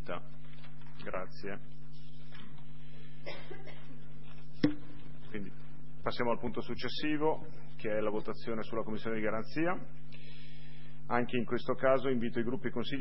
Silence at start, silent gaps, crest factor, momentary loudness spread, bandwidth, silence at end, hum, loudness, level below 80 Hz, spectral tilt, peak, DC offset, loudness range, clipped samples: 0 s; none; 24 dB; 20 LU; 5.8 kHz; 0 s; none; -36 LUFS; -60 dBFS; -4.5 dB/octave; -12 dBFS; 3%; 12 LU; under 0.1%